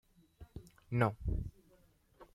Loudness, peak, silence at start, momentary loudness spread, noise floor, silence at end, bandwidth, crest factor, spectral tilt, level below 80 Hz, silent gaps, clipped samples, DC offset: -37 LUFS; -16 dBFS; 0.4 s; 21 LU; -68 dBFS; 0.1 s; 13 kHz; 24 dB; -8.5 dB/octave; -48 dBFS; none; under 0.1%; under 0.1%